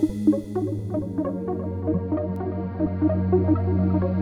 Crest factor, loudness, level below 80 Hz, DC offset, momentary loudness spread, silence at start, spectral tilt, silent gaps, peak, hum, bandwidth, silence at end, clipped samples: 16 dB; -25 LUFS; -46 dBFS; under 0.1%; 7 LU; 0 s; -10.5 dB/octave; none; -8 dBFS; none; 6.4 kHz; 0 s; under 0.1%